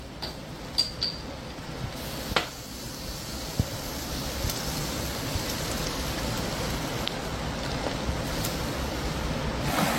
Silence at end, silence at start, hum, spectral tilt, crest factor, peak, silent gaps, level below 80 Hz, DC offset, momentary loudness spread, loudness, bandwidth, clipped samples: 0 s; 0 s; none; -4 dB/octave; 28 dB; -4 dBFS; none; -40 dBFS; under 0.1%; 8 LU; -31 LUFS; 16.5 kHz; under 0.1%